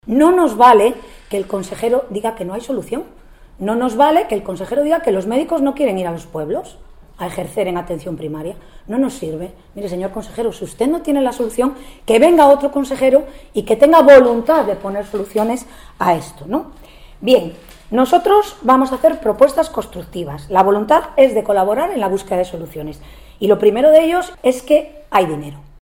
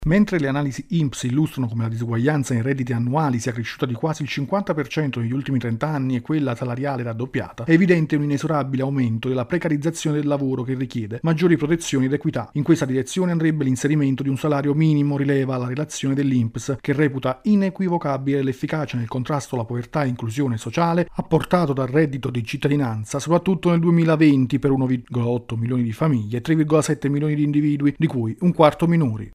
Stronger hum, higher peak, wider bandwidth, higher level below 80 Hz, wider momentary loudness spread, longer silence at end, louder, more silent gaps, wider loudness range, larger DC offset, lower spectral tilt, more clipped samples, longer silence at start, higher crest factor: neither; about the same, 0 dBFS vs -2 dBFS; first, 17 kHz vs 14.5 kHz; first, -42 dBFS vs -50 dBFS; first, 16 LU vs 7 LU; first, 0.2 s vs 0 s; first, -15 LUFS vs -21 LUFS; neither; first, 11 LU vs 4 LU; neither; second, -5.5 dB/octave vs -7 dB/octave; neither; about the same, 0.05 s vs 0 s; about the same, 16 dB vs 20 dB